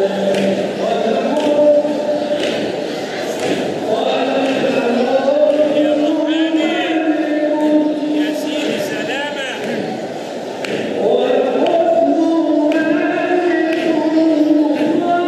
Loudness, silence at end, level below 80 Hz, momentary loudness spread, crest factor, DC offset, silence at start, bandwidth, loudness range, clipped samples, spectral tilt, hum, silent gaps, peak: -16 LUFS; 0 s; -66 dBFS; 8 LU; 12 dB; under 0.1%; 0 s; 13.5 kHz; 4 LU; under 0.1%; -5 dB/octave; none; none; -2 dBFS